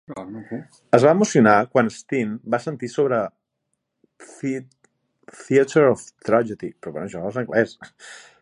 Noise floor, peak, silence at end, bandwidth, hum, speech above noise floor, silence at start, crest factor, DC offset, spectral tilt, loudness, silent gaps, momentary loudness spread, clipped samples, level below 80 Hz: -77 dBFS; 0 dBFS; 0.25 s; 11 kHz; none; 56 dB; 0.1 s; 22 dB; under 0.1%; -6 dB/octave; -20 LUFS; none; 19 LU; under 0.1%; -64 dBFS